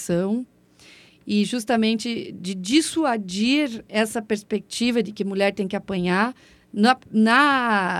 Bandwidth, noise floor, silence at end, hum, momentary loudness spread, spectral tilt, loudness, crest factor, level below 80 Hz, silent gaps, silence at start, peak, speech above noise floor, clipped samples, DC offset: 14 kHz; -51 dBFS; 0 s; none; 11 LU; -4.5 dB/octave; -22 LUFS; 18 dB; -60 dBFS; none; 0 s; -4 dBFS; 29 dB; under 0.1%; under 0.1%